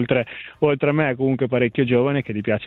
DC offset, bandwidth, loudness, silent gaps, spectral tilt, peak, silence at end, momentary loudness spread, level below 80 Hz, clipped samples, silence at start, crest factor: under 0.1%; 4.2 kHz; -20 LUFS; none; -10 dB/octave; -6 dBFS; 0 s; 5 LU; -56 dBFS; under 0.1%; 0 s; 16 dB